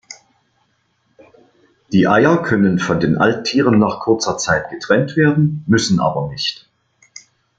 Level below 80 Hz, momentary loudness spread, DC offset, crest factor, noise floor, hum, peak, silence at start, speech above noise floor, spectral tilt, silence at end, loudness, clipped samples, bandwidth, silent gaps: -50 dBFS; 6 LU; under 0.1%; 16 dB; -63 dBFS; none; -2 dBFS; 0.1 s; 48 dB; -5.5 dB/octave; 1.05 s; -16 LUFS; under 0.1%; 9.2 kHz; none